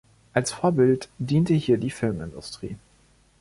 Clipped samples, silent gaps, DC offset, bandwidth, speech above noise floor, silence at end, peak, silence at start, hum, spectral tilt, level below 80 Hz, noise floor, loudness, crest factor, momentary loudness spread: under 0.1%; none; under 0.1%; 11.5 kHz; 36 dB; 0.65 s; -6 dBFS; 0.35 s; none; -6.5 dB/octave; -52 dBFS; -59 dBFS; -24 LUFS; 18 dB; 15 LU